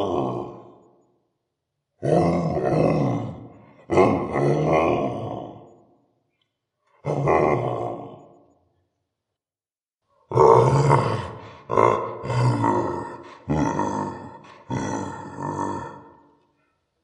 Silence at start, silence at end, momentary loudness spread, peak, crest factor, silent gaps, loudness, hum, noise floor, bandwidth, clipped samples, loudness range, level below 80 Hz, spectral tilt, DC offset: 0 s; 1 s; 18 LU; -2 dBFS; 22 dB; 9.94-9.98 s; -22 LUFS; none; under -90 dBFS; 10.5 kHz; under 0.1%; 8 LU; -50 dBFS; -7.5 dB/octave; under 0.1%